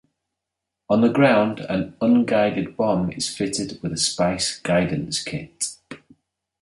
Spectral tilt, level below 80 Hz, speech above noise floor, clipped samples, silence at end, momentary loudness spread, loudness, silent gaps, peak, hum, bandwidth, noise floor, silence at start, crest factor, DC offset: -4.5 dB/octave; -52 dBFS; 62 dB; under 0.1%; 0.65 s; 11 LU; -21 LUFS; none; -4 dBFS; none; 11.5 kHz; -83 dBFS; 0.9 s; 18 dB; under 0.1%